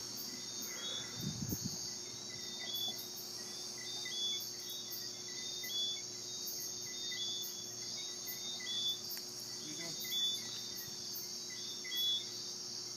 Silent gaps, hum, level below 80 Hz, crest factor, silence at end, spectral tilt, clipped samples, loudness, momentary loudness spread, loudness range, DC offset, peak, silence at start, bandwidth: none; none; -74 dBFS; 18 dB; 0 s; -1 dB/octave; under 0.1%; -39 LUFS; 7 LU; 2 LU; under 0.1%; -24 dBFS; 0 s; 15.5 kHz